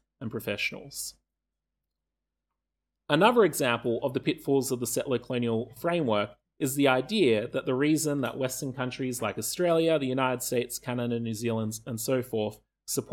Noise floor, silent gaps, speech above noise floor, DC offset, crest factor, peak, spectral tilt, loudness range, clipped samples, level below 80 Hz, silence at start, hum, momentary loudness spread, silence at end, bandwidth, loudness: -87 dBFS; none; 59 dB; under 0.1%; 22 dB; -6 dBFS; -4.5 dB/octave; 2 LU; under 0.1%; -64 dBFS; 0.2 s; none; 9 LU; 0 s; 19 kHz; -28 LUFS